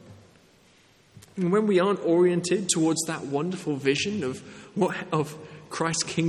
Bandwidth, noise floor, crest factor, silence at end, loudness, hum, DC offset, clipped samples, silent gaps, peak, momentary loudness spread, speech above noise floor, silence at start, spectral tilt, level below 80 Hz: 13 kHz; -58 dBFS; 20 dB; 0 s; -25 LUFS; none; under 0.1%; under 0.1%; none; -8 dBFS; 13 LU; 33 dB; 0.05 s; -4.5 dB/octave; -68 dBFS